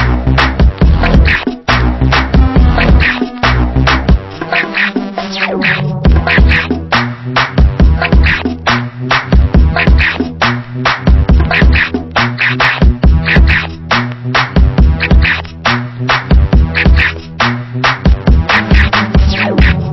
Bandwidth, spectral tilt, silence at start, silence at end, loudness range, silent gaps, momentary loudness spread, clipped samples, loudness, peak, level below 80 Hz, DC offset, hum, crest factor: 6 kHz; -6.5 dB/octave; 0 s; 0 s; 1 LU; none; 5 LU; 0.3%; -11 LUFS; 0 dBFS; -12 dBFS; under 0.1%; none; 10 dB